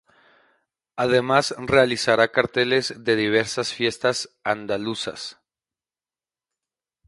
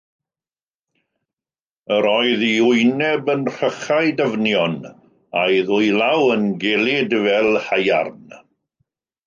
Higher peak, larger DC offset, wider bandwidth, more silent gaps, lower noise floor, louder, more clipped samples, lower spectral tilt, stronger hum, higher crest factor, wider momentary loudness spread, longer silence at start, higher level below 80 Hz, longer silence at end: about the same, -2 dBFS vs -4 dBFS; neither; first, 11.5 kHz vs 7.4 kHz; neither; about the same, under -90 dBFS vs under -90 dBFS; second, -22 LUFS vs -18 LUFS; neither; about the same, -4 dB/octave vs -5 dB/octave; neither; first, 22 dB vs 16 dB; first, 10 LU vs 6 LU; second, 0.95 s vs 1.9 s; first, -58 dBFS vs -66 dBFS; first, 1.75 s vs 0.9 s